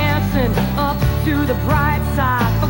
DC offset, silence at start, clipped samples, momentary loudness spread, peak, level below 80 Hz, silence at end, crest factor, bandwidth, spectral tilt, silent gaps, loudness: 0.3%; 0 s; under 0.1%; 2 LU; -4 dBFS; -24 dBFS; 0 s; 12 dB; 17 kHz; -7 dB/octave; none; -17 LUFS